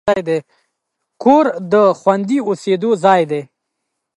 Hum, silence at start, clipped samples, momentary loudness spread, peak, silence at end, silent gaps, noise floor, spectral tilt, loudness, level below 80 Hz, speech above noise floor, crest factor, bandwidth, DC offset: none; 0.05 s; under 0.1%; 9 LU; 0 dBFS; 0.75 s; none; -75 dBFS; -6.5 dB/octave; -15 LUFS; -58 dBFS; 61 dB; 16 dB; 11.5 kHz; under 0.1%